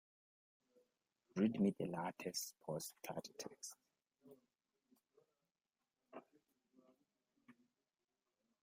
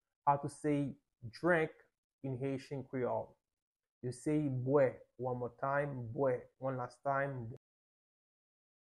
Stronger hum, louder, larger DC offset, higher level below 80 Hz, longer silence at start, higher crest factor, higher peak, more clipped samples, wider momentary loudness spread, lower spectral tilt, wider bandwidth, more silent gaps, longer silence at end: neither; second, -44 LUFS vs -37 LUFS; neither; second, -86 dBFS vs -70 dBFS; first, 1.35 s vs 0.25 s; about the same, 24 dB vs 20 dB; second, -24 dBFS vs -18 dBFS; neither; first, 22 LU vs 14 LU; second, -5 dB/octave vs -7.5 dB/octave; first, 16 kHz vs 11.5 kHz; second, none vs 1.98-2.19 s, 3.62-3.72 s, 3.91-4.01 s; second, 1.1 s vs 1.3 s